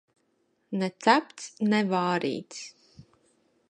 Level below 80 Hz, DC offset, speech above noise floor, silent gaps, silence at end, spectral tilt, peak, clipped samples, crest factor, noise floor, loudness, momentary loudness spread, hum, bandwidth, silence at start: -74 dBFS; under 0.1%; 45 dB; none; 0.65 s; -5 dB/octave; -4 dBFS; under 0.1%; 24 dB; -72 dBFS; -27 LUFS; 18 LU; none; 10 kHz; 0.7 s